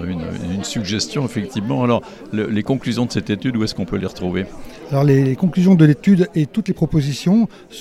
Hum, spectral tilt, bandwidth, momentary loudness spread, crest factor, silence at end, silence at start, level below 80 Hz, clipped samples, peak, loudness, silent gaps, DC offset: none; -6.5 dB/octave; 13 kHz; 11 LU; 16 dB; 0 s; 0 s; -44 dBFS; under 0.1%; 0 dBFS; -18 LUFS; none; under 0.1%